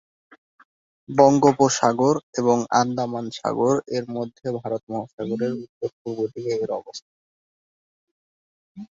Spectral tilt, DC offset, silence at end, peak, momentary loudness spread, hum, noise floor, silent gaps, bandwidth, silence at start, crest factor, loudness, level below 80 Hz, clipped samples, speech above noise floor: -5.5 dB/octave; under 0.1%; 0.15 s; 0 dBFS; 14 LU; none; under -90 dBFS; 2.23-2.33 s, 4.83-4.87 s, 5.13-5.18 s, 5.69-5.81 s, 5.93-6.05 s, 7.02-8.75 s; 7.8 kHz; 1.1 s; 22 dB; -22 LUFS; -64 dBFS; under 0.1%; over 68 dB